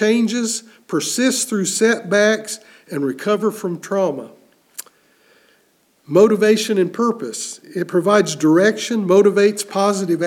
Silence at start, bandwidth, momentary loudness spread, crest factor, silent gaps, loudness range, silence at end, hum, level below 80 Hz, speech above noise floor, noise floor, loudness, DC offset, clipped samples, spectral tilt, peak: 0 s; 16.5 kHz; 13 LU; 16 dB; none; 7 LU; 0 s; none; -72 dBFS; 42 dB; -59 dBFS; -17 LUFS; under 0.1%; under 0.1%; -4 dB/octave; -2 dBFS